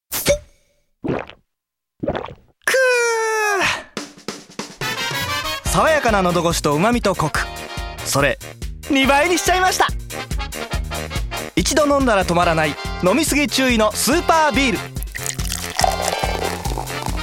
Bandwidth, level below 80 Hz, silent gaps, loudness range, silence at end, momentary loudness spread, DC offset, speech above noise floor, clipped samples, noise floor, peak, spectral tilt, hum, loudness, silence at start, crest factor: 17 kHz; -32 dBFS; none; 3 LU; 0 s; 13 LU; under 0.1%; 65 dB; under 0.1%; -82 dBFS; 0 dBFS; -3.5 dB/octave; none; -18 LUFS; 0.1 s; 18 dB